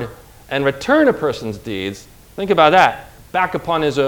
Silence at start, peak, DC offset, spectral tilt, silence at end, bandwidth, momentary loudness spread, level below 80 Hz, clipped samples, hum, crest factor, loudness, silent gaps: 0 s; 0 dBFS; under 0.1%; -5.5 dB/octave; 0 s; over 20 kHz; 18 LU; -46 dBFS; under 0.1%; none; 18 dB; -17 LUFS; none